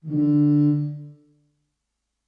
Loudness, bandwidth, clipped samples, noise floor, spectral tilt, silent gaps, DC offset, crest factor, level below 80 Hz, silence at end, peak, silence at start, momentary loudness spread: -20 LUFS; 4.7 kHz; under 0.1%; -79 dBFS; -12.5 dB/octave; none; under 0.1%; 12 dB; -72 dBFS; 1.15 s; -12 dBFS; 0.05 s; 14 LU